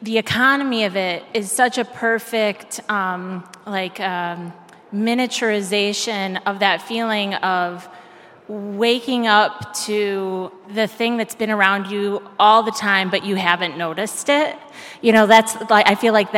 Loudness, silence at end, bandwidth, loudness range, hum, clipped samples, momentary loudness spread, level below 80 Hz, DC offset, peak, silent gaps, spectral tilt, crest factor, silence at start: -18 LUFS; 0 s; 16.5 kHz; 6 LU; none; under 0.1%; 13 LU; -66 dBFS; under 0.1%; 0 dBFS; none; -3.5 dB/octave; 20 dB; 0 s